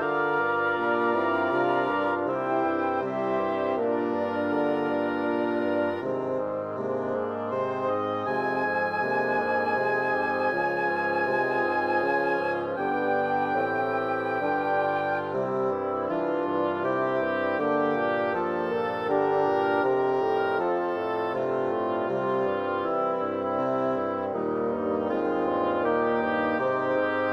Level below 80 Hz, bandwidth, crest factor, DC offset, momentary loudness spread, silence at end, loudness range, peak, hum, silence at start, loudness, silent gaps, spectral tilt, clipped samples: -70 dBFS; 6.8 kHz; 14 dB; under 0.1%; 4 LU; 0 s; 2 LU; -12 dBFS; none; 0 s; -26 LUFS; none; -7.5 dB/octave; under 0.1%